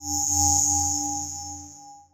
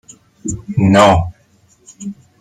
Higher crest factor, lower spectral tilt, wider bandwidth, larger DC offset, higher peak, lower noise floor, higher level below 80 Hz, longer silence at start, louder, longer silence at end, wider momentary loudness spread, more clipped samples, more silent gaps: about the same, 20 dB vs 16 dB; second, -2 dB/octave vs -6 dB/octave; first, 16 kHz vs 12 kHz; neither; second, -6 dBFS vs 0 dBFS; second, -46 dBFS vs -53 dBFS; second, -48 dBFS vs -38 dBFS; second, 0 s vs 0.45 s; second, -21 LUFS vs -13 LUFS; second, 0.15 s vs 0.3 s; about the same, 19 LU vs 21 LU; neither; neither